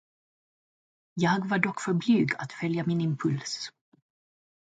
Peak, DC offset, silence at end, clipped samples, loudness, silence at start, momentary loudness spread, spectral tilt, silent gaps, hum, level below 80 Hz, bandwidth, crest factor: -6 dBFS; under 0.1%; 1 s; under 0.1%; -28 LUFS; 1.15 s; 10 LU; -6 dB/octave; none; none; -72 dBFS; 9.2 kHz; 22 dB